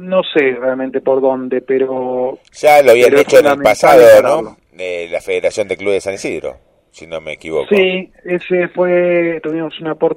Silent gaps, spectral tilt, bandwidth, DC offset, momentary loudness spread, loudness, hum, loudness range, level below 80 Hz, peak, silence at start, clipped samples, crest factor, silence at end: none; -4.5 dB/octave; 16.5 kHz; under 0.1%; 15 LU; -12 LUFS; none; 9 LU; -52 dBFS; 0 dBFS; 0 s; 0.3%; 12 dB; 0 s